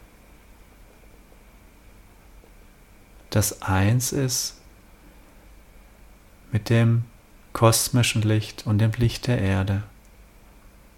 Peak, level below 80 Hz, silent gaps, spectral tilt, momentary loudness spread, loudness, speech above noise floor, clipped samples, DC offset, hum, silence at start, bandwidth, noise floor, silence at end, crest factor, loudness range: -4 dBFS; -46 dBFS; none; -5 dB/octave; 10 LU; -23 LUFS; 29 dB; under 0.1%; under 0.1%; none; 3.3 s; 16.5 kHz; -51 dBFS; 1.1 s; 22 dB; 6 LU